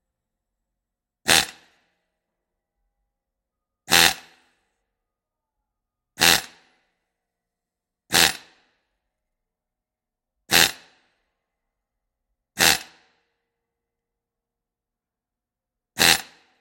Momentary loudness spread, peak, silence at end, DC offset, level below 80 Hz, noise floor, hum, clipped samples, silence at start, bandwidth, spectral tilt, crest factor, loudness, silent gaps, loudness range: 16 LU; 0 dBFS; 0.4 s; under 0.1%; -58 dBFS; -88 dBFS; none; under 0.1%; 1.25 s; 16.5 kHz; -0.5 dB/octave; 28 dB; -18 LUFS; none; 4 LU